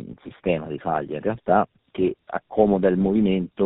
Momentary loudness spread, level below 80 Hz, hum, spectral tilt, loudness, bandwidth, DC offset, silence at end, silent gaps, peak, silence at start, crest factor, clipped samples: 10 LU; -52 dBFS; none; -7 dB/octave; -23 LUFS; 4 kHz; under 0.1%; 0 s; none; -4 dBFS; 0 s; 20 dB; under 0.1%